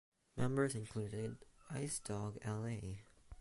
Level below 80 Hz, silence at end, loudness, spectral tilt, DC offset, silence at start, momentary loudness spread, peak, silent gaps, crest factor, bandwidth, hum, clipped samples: -64 dBFS; 0 s; -43 LUFS; -5.5 dB/octave; under 0.1%; 0.35 s; 15 LU; -24 dBFS; none; 18 dB; 11.5 kHz; none; under 0.1%